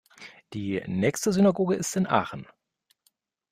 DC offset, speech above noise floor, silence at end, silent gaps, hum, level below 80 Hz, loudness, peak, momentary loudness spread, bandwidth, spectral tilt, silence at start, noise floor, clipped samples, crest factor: under 0.1%; 47 dB; 1.1 s; none; none; -62 dBFS; -26 LUFS; -8 dBFS; 19 LU; 15.5 kHz; -5.5 dB/octave; 0.2 s; -72 dBFS; under 0.1%; 20 dB